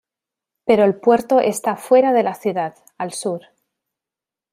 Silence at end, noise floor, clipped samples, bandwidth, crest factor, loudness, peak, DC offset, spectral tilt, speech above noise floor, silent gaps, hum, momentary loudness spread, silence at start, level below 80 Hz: 1.15 s; -88 dBFS; under 0.1%; 15.5 kHz; 18 dB; -18 LUFS; -2 dBFS; under 0.1%; -5 dB/octave; 71 dB; none; none; 13 LU; 0.65 s; -64 dBFS